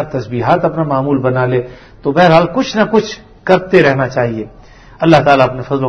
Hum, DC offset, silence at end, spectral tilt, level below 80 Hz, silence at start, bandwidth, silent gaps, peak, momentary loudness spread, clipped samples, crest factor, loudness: none; under 0.1%; 0 s; -7 dB/octave; -42 dBFS; 0 s; 9 kHz; none; 0 dBFS; 12 LU; 0.4%; 12 dB; -12 LUFS